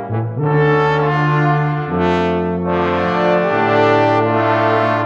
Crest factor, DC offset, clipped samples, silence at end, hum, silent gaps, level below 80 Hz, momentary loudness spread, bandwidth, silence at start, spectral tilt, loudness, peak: 12 dB; under 0.1%; under 0.1%; 0 s; none; none; -44 dBFS; 5 LU; 7 kHz; 0 s; -8 dB/octave; -15 LUFS; -2 dBFS